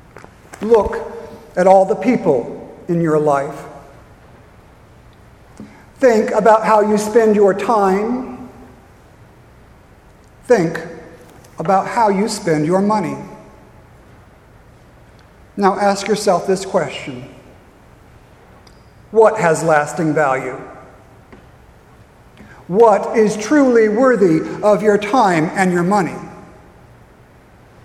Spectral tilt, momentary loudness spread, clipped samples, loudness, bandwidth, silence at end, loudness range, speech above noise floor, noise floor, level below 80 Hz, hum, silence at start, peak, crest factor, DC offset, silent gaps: -6 dB/octave; 19 LU; under 0.1%; -15 LUFS; 13.5 kHz; 1.45 s; 8 LU; 31 dB; -45 dBFS; -48 dBFS; none; 0.5 s; 0 dBFS; 18 dB; under 0.1%; none